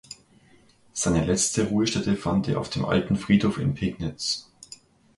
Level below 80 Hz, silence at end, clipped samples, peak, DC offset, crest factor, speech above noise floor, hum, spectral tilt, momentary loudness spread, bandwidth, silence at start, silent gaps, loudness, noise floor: -46 dBFS; 0.45 s; under 0.1%; -8 dBFS; under 0.1%; 18 dB; 33 dB; none; -4.5 dB/octave; 20 LU; 11.5 kHz; 0.1 s; none; -25 LUFS; -57 dBFS